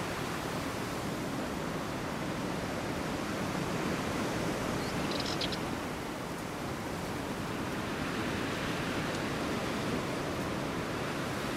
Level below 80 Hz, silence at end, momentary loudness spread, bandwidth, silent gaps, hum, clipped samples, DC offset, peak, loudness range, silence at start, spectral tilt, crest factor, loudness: -52 dBFS; 0 s; 3 LU; 16 kHz; none; none; under 0.1%; under 0.1%; -20 dBFS; 2 LU; 0 s; -4.5 dB/octave; 16 dB; -35 LUFS